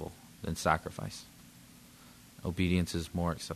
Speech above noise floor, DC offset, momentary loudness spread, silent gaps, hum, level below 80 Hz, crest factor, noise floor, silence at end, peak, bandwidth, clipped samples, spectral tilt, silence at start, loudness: 23 dB; under 0.1%; 24 LU; none; none; -52 dBFS; 26 dB; -56 dBFS; 0 s; -10 dBFS; 13.5 kHz; under 0.1%; -5.5 dB/octave; 0 s; -34 LUFS